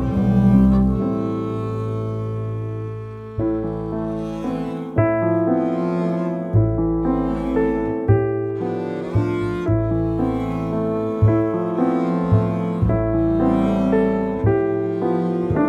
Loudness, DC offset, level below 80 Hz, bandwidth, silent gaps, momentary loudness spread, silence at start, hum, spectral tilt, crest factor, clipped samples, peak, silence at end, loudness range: -20 LUFS; under 0.1%; -34 dBFS; 6.2 kHz; none; 8 LU; 0 s; none; -10 dB/octave; 16 dB; under 0.1%; -4 dBFS; 0 s; 5 LU